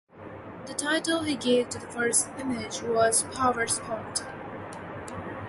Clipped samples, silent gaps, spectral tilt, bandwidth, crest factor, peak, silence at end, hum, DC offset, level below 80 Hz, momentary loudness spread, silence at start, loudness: under 0.1%; none; -2.5 dB/octave; 12 kHz; 20 dB; -8 dBFS; 0 s; none; under 0.1%; -58 dBFS; 15 LU; 0.15 s; -27 LUFS